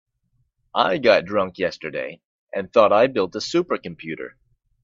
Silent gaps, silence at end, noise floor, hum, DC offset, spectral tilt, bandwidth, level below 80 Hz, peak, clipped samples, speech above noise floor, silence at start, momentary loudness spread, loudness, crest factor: 2.25-2.47 s; 0.55 s; -68 dBFS; none; under 0.1%; -5 dB/octave; 7.8 kHz; -62 dBFS; -2 dBFS; under 0.1%; 48 dB; 0.75 s; 16 LU; -21 LUFS; 22 dB